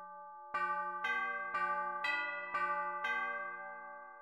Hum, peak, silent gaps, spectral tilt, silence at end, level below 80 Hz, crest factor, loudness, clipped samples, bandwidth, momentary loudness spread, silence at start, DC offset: none; -24 dBFS; none; -3 dB/octave; 0 s; -80 dBFS; 14 dB; -37 LUFS; under 0.1%; 14 kHz; 12 LU; 0 s; under 0.1%